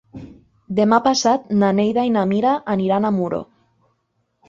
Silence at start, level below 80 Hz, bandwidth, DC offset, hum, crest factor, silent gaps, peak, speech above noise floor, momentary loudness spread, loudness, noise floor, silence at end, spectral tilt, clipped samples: 0.15 s; -56 dBFS; 7.6 kHz; under 0.1%; none; 18 dB; none; -2 dBFS; 52 dB; 10 LU; -18 LUFS; -69 dBFS; 1.05 s; -5.5 dB/octave; under 0.1%